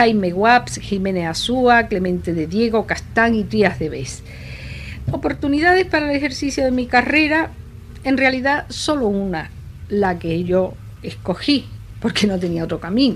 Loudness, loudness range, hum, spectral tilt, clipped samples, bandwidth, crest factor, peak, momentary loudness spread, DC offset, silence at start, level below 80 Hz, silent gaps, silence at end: -18 LUFS; 4 LU; none; -5 dB/octave; under 0.1%; 13.5 kHz; 18 dB; 0 dBFS; 16 LU; under 0.1%; 0 s; -38 dBFS; none; 0 s